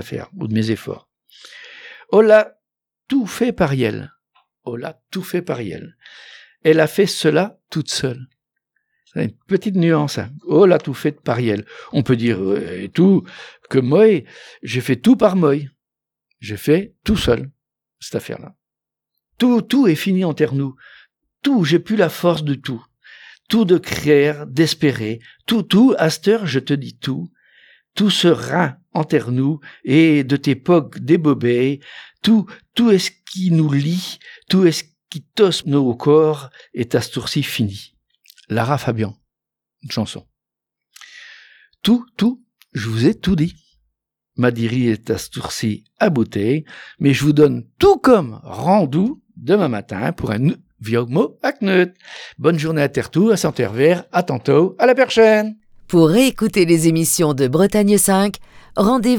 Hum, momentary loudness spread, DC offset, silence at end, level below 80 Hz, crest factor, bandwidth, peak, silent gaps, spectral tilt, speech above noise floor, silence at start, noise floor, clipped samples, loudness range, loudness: none; 15 LU; under 0.1%; 0 s; -48 dBFS; 18 dB; 19.5 kHz; 0 dBFS; none; -5.5 dB/octave; 70 dB; 0 s; -86 dBFS; under 0.1%; 8 LU; -17 LUFS